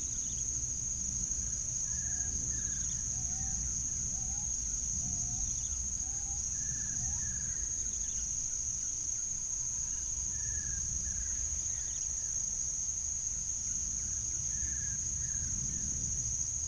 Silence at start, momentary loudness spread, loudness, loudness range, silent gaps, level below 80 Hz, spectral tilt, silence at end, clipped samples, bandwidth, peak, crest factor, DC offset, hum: 0 s; 1 LU; -33 LUFS; 0 LU; none; -46 dBFS; -1.5 dB/octave; 0 s; under 0.1%; 10.5 kHz; -20 dBFS; 14 dB; under 0.1%; none